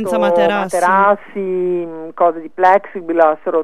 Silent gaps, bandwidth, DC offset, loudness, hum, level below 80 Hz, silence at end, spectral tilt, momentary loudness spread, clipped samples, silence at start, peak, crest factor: none; 13.5 kHz; 1%; -15 LUFS; none; -60 dBFS; 0 s; -5.5 dB/octave; 8 LU; under 0.1%; 0 s; 0 dBFS; 14 dB